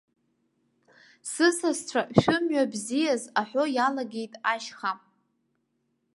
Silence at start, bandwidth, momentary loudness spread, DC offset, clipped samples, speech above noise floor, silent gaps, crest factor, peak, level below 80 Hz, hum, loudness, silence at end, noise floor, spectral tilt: 1.25 s; 11.5 kHz; 10 LU; under 0.1%; under 0.1%; 49 dB; none; 26 dB; -2 dBFS; -62 dBFS; none; -27 LUFS; 1.2 s; -75 dBFS; -4.5 dB/octave